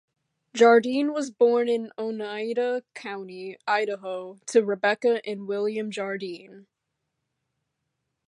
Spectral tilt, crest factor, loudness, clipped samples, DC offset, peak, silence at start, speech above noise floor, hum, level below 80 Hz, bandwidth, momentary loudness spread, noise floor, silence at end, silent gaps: -4.5 dB/octave; 20 dB; -25 LUFS; under 0.1%; under 0.1%; -6 dBFS; 0.55 s; 56 dB; none; -84 dBFS; 11 kHz; 15 LU; -81 dBFS; 1.7 s; none